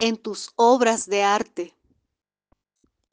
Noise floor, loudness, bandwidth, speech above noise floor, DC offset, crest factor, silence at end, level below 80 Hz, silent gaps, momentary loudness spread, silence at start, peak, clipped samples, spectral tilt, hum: -82 dBFS; -21 LUFS; 10 kHz; 61 dB; under 0.1%; 18 dB; 1.45 s; -70 dBFS; none; 16 LU; 0 s; -4 dBFS; under 0.1%; -2.5 dB/octave; none